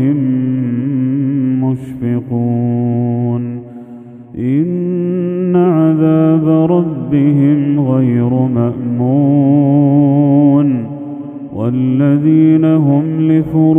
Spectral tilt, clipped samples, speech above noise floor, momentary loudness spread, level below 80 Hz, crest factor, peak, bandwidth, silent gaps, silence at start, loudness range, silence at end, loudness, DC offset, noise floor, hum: -12 dB/octave; under 0.1%; 20 dB; 10 LU; -52 dBFS; 12 dB; 0 dBFS; 3.5 kHz; none; 0 s; 5 LU; 0 s; -12 LUFS; under 0.1%; -33 dBFS; none